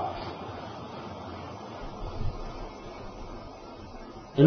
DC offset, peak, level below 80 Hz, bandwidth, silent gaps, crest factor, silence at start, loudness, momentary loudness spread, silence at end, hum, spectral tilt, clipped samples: under 0.1%; -6 dBFS; -44 dBFS; 6.4 kHz; none; 26 dB; 0 s; -40 LUFS; 7 LU; 0 s; none; -7 dB/octave; under 0.1%